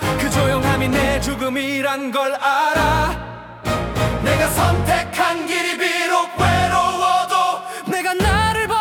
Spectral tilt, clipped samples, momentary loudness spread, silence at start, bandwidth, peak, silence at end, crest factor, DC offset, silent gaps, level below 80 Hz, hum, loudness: -4.5 dB/octave; under 0.1%; 6 LU; 0 s; 18 kHz; -4 dBFS; 0 s; 14 dB; under 0.1%; none; -32 dBFS; none; -18 LUFS